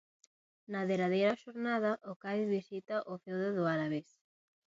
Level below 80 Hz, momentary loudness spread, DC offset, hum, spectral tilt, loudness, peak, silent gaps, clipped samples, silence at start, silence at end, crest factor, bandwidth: -82 dBFS; 8 LU; under 0.1%; none; -5.5 dB/octave; -35 LUFS; -16 dBFS; 2.16-2.20 s; under 0.1%; 0.7 s; 0.65 s; 20 dB; 7.6 kHz